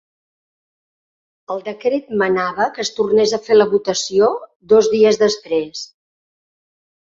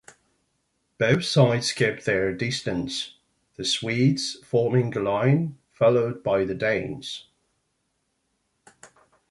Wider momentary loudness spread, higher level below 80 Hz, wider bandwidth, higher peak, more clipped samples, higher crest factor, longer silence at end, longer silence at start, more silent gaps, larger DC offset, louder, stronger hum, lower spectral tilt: first, 14 LU vs 10 LU; about the same, -60 dBFS vs -58 dBFS; second, 7.8 kHz vs 11.5 kHz; first, -2 dBFS vs -6 dBFS; neither; about the same, 16 dB vs 20 dB; first, 1.15 s vs 0.45 s; first, 1.5 s vs 1 s; first, 4.56-4.60 s vs none; neither; first, -16 LUFS vs -24 LUFS; neither; second, -3.5 dB/octave vs -5.5 dB/octave